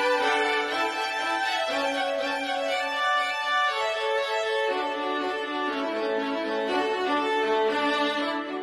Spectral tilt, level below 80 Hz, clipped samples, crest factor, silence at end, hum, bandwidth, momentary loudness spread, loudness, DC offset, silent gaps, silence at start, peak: -2 dB/octave; -68 dBFS; under 0.1%; 14 dB; 0 s; none; 13 kHz; 4 LU; -26 LUFS; under 0.1%; none; 0 s; -12 dBFS